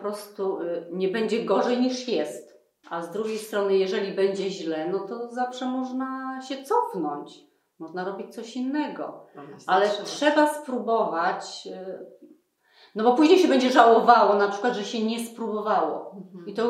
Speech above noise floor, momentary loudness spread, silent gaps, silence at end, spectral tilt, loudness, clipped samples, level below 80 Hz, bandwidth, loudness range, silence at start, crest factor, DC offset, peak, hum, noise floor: 36 dB; 19 LU; none; 0 s; -4.5 dB/octave; -24 LUFS; under 0.1%; -82 dBFS; 14 kHz; 10 LU; 0 s; 24 dB; under 0.1%; -2 dBFS; none; -60 dBFS